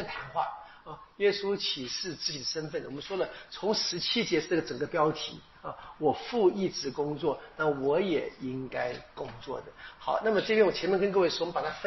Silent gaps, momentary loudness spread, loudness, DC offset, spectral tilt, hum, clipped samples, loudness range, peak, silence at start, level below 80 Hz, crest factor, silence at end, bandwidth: none; 14 LU; -30 LUFS; under 0.1%; -3 dB/octave; none; under 0.1%; 3 LU; -12 dBFS; 0 s; -62 dBFS; 20 dB; 0 s; 6.2 kHz